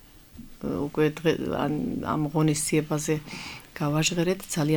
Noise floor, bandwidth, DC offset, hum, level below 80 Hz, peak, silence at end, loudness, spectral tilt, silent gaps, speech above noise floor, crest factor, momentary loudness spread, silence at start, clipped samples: -47 dBFS; 19 kHz; under 0.1%; none; -52 dBFS; -10 dBFS; 0 s; -26 LUFS; -5 dB/octave; none; 21 dB; 16 dB; 9 LU; 0.35 s; under 0.1%